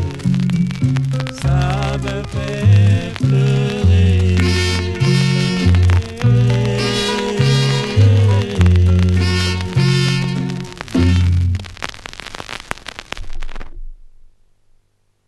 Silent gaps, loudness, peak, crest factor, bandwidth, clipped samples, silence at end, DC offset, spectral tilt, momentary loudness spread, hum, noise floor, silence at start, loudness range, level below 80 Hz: none; -15 LUFS; 0 dBFS; 16 dB; 12 kHz; under 0.1%; 1.2 s; under 0.1%; -6 dB/octave; 15 LU; none; -59 dBFS; 0 s; 7 LU; -24 dBFS